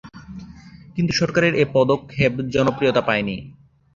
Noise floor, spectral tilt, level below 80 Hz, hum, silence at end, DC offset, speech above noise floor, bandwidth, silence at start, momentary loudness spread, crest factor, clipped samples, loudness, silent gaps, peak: -42 dBFS; -6 dB/octave; -48 dBFS; none; 0.45 s; under 0.1%; 23 dB; 7.6 kHz; 0.05 s; 20 LU; 18 dB; under 0.1%; -20 LUFS; none; -2 dBFS